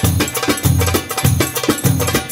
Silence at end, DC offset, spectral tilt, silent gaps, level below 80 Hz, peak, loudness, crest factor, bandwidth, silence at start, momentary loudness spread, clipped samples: 0 s; under 0.1%; -4.5 dB/octave; none; -32 dBFS; 0 dBFS; -16 LUFS; 16 dB; 16.5 kHz; 0 s; 2 LU; under 0.1%